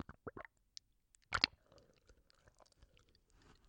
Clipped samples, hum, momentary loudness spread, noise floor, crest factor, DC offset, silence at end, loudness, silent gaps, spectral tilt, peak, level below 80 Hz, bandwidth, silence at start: under 0.1%; none; 22 LU; -75 dBFS; 38 dB; under 0.1%; 1.55 s; -40 LUFS; none; -2 dB/octave; -12 dBFS; -68 dBFS; 16.5 kHz; 0.25 s